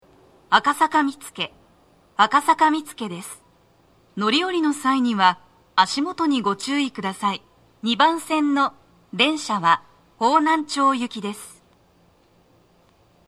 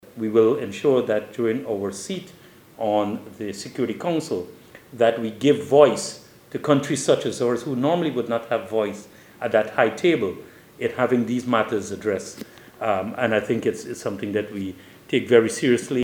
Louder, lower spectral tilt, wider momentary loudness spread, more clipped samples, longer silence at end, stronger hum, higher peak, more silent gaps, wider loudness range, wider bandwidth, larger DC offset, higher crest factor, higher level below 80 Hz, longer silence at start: about the same, -21 LUFS vs -23 LUFS; second, -3.5 dB/octave vs -5 dB/octave; about the same, 14 LU vs 14 LU; neither; first, 1.8 s vs 0 s; neither; about the same, 0 dBFS vs -2 dBFS; neither; second, 2 LU vs 5 LU; second, 14 kHz vs 18.5 kHz; neither; about the same, 22 dB vs 20 dB; about the same, -66 dBFS vs -66 dBFS; first, 0.5 s vs 0.15 s